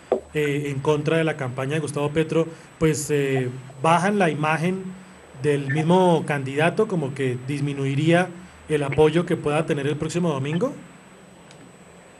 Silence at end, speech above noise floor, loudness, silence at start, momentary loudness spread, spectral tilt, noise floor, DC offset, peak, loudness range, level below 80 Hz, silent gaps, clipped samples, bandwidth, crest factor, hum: 0.2 s; 25 dB; -23 LUFS; 0.1 s; 8 LU; -6 dB/octave; -47 dBFS; under 0.1%; -4 dBFS; 2 LU; -56 dBFS; none; under 0.1%; 12.5 kHz; 20 dB; none